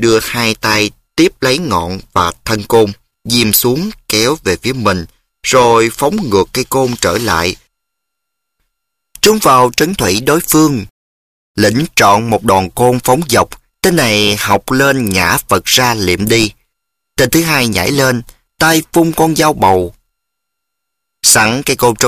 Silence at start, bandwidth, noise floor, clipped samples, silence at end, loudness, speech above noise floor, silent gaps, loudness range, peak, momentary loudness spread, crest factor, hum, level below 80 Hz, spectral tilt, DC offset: 0 s; over 20 kHz; -76 dBFS; 0.1%; 0 s; -11 LUFS; 64 dB; 10.90-11.54 s; 2 LU; 0 dBFS; 7 LU; 12 dB; none; -38 dBFS; -3.5 dB/octave; under 0.1%